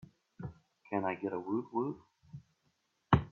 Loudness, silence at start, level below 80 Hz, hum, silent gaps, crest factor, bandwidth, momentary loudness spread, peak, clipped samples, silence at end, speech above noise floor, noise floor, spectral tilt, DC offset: -36 LUFS; 0.4 s; -56 dBFS; none; none; 26 dB; 6.6 kHz; 23 LU; -12 dBFS; under 0.1%; 0 s; 42 dB; -78 dBFS; -9 dB/octave; under 0.1%